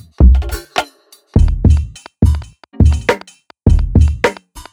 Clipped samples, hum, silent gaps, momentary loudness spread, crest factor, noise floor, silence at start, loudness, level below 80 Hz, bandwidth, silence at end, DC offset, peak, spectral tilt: under 0.1%; none; none; 11 LU; 12 dB; -45 dBFS; 0.2 s; -15 LUFS; -16 dBFS; 13 kHz; 0.1 s; under 0.1%; 0 dBFS; -7 dB/octave